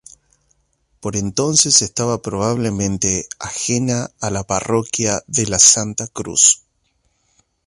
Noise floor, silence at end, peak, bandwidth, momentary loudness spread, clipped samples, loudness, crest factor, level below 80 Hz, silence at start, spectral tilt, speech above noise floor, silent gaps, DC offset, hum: -65 dBFS; 1.1 s; 0 dBFS; 16 kHz; 13 LU; under 0.1%; -16 LUFS; 20 dB; -46 dBFS; 1.05 s; -2.5 dB/octave; 47 dB; none; under 0.1%; none